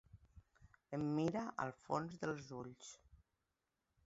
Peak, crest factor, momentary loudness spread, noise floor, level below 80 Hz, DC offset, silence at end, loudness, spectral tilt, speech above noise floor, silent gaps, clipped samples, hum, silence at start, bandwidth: -24 dBFS; 22 dB; 17 LU; -89 dBFS; -72 dBFS; under 0.1%; 1.1 s; -43 LUFS; -6.5 dB/octave; 46 dB; none; under 0.1%; none; 0.15 s; 7.6 kHz